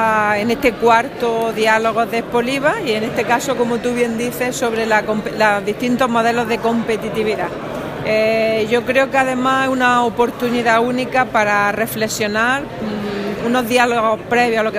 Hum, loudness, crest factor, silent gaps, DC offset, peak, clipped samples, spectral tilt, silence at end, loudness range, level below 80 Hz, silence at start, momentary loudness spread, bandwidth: none; -17 LUFS; 16 dB; none; under 0.1%; 0 dBFS; under 0.1%; -4.5 dB/octave; 0 s; 2 LU; -46 dBFS; 0 s; 6 LU; 15.5 kHz